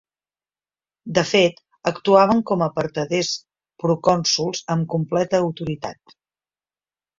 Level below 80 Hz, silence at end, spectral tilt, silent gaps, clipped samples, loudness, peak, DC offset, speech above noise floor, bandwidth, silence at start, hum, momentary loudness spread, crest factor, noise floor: -58 dBFS; 1.25 s; -4.5 dB/octave; none; under 0.1%; -20 LUFS; -2 dBFS; under 0.1%; over 70 dB; 7.6 kHz; 1.05 s; none; 12 LU; 20 dB; under -90 dBFS